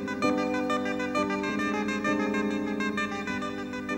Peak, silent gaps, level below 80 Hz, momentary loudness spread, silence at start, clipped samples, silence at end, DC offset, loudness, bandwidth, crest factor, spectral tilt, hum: -12 dBFS; none; -60 dBFS; 5 LU; 0 s; under 0.1%; 0 s; under 0.1%; -29 LUFS; 16 kHz; 16 dB; -5 dB/octave; 50 Hz at -50 dBFS